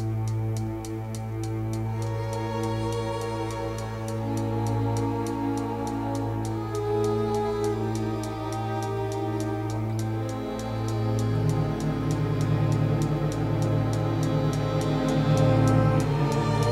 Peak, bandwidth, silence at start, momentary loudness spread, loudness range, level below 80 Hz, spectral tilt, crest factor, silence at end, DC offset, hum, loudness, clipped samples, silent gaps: -10 dBFS; 14 kHz; 0 s; 7 LU; 6 LU; -44 dBFS; -7 dB/octave; 16 dB; 0 s; under 0.1%; none; -27 LUFS; under 0.1%; none